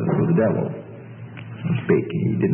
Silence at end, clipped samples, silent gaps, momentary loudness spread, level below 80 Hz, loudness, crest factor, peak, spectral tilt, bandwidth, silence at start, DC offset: 0 s; under 0.1%; none; 19 LU; -58 dBFS; -22 LUFS; 16 dB; -6 dBFS; -13.5 dB/octave; 3.5 kHz; 0 s; under 0.1%